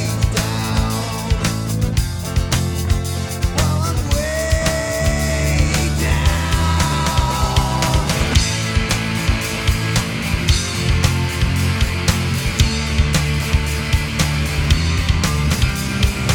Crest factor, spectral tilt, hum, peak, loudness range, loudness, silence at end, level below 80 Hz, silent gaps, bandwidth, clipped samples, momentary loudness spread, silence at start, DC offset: 16 dB; -4.5 dB/octave; none; 0 dBFS; 2 LU; -18 LUFS; 0 s; -22 dBFS; none; 19.5 kHz; under 0.1%; 3 LU; 0 s; under 0.1%